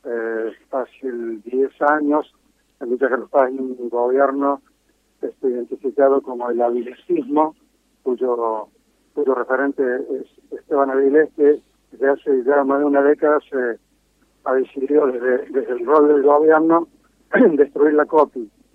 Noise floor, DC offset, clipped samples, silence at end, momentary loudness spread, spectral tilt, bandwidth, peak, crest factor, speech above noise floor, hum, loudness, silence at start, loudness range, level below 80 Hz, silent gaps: -62 dBFS; under 0.1%; under 0.1%; 0.3 s; 13 LU; -8 dB/octave; 3.7 kHz; -2 dBFS; 16 dB; 45 dB; none; -19 LUFS; 0.05 s; 6 LU; -68 dBFS; none